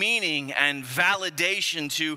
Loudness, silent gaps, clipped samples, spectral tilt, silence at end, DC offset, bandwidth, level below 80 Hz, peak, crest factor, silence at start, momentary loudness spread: -23 LUFS; none; under 0.1%; -2 dB/octave; 0 s; under 0.1%; 16 kHz; -76 dBFS; -6 dBFS; 20 dB; 0 s; 3 LU